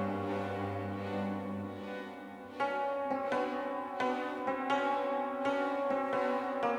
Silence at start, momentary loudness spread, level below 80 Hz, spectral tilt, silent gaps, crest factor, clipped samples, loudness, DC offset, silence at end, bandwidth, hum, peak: 0 s; 9 LU; -74 dBFS; -6.5 dB/octave; none; 16 dB; under 0.1%; -35 LUFS; under 0.1%; 0 s; 13 kHz; none; -18 dBFS